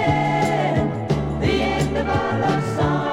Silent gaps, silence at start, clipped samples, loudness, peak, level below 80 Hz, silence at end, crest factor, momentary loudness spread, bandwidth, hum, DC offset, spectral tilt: none; 0 s; under 0.1%; -21 LUFS; -6 dBFS; -36 dBFS; 0 s; 14 dB; 3 LU; 12.5 kHz; none; under 0.1%; -6.5 dB/octave